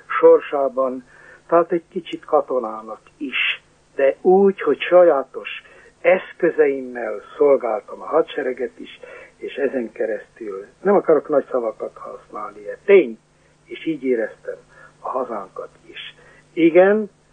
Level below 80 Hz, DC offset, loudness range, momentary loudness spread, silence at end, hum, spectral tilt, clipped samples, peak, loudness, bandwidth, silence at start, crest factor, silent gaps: -64 dBFS; under 0.1%; 5 LU; 20 LU; 0.25 s; none; -7 dB/octave; under 0.1%; -2 dBFS; -19 LUFS; 7 kHz; 0.1 s; 18 dB; none